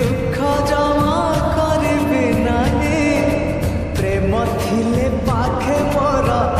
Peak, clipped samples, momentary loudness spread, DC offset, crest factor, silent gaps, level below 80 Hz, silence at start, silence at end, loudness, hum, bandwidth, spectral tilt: -4 dBFS; under 0.1%; 3 LU; under 0.1%; 12 dB; none; -28 dBFS; 0 s; 0 s; -17 LUFS; none; 15 kHz; -6.5 dB/octave